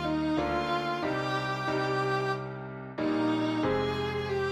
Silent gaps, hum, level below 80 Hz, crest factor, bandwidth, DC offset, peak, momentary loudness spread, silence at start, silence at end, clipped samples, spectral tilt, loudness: none; none; -54 dBFS; 12 dB; 12.5 kHz; under 0.1%; -18 dBFS; 5 LU; 0 s; 0 s; under 0.1%; -6.5 dB/octave; -30 LUFS